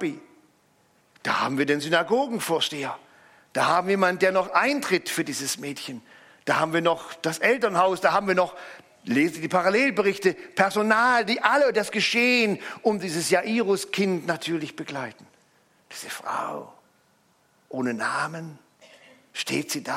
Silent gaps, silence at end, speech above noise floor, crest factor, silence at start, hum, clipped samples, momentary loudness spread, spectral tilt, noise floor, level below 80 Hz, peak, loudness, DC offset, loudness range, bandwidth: none; 0 s; 40 dB; 22 dB; 0 s; none; under 0.1%; 15 LU; -3.5 dB/octave; -64 dBFS; -72 dBFS; -4 dBFS; -24 LUFS; under 0.1%; 11 LU; 16.5 kHz